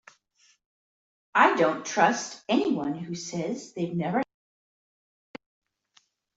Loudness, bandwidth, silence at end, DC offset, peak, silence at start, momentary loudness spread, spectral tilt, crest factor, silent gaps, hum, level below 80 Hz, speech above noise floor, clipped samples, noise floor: -26 LUFS; 8 kHz; 2.15 s; under 0.1%; -4 dBFS; 1.35 s; 12 LU; -4.5 dB/octave; 24 dB; none; none; -72 dBFS; 40 dB; under 0.1%; -66 dBFS